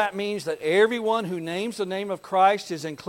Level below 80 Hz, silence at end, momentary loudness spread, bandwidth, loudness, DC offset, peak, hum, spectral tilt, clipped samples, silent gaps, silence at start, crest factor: -70 dBFS; 0 s; 9 LU; 16.5 kHz; -24 LUFS; under 0.1%; -8 dBFS; none; -4.5 dB/octave; under 0.1%; none; 0 s; 18 dB